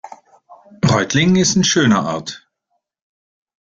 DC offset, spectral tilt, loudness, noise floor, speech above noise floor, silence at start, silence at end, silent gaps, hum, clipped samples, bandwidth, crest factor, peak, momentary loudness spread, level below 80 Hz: under 0.1%; -4 dB/octave; -15 LUFS; -72 dBFS; 57 dB; 0.05 s; 1.3 s; none; none; under 0.1%; 7.8 kHz; 16 dB; -2 dBFS; 14 LU; -50 dBFS